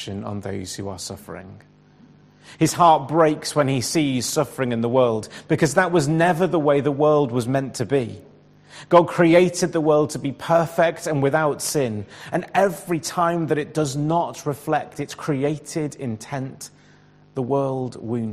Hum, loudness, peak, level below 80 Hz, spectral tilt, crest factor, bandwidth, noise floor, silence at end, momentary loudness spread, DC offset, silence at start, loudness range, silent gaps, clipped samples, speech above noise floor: none; -21 LUFS; -2 dBFS; -58 dBFS; -5.5 dB/octave; 20 dB; 15 kHz; -52 dBFS; 0 s; 14 LU; under 0.1%; 0 s; 6 LU; none; under 0.1%; 31 dB